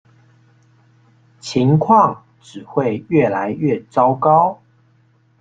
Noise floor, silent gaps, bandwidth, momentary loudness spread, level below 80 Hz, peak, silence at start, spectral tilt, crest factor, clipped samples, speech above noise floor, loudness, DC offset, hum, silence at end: -56 dBFS; none; 8.8 kHz; 22 LU; -56 dBFS; 0 dBFS; 1.45 s; -7.5 dB/octave; 18 dB; under 0.1%; 40 dB; -16 LUFS; under 0.1%; none; 0.85 s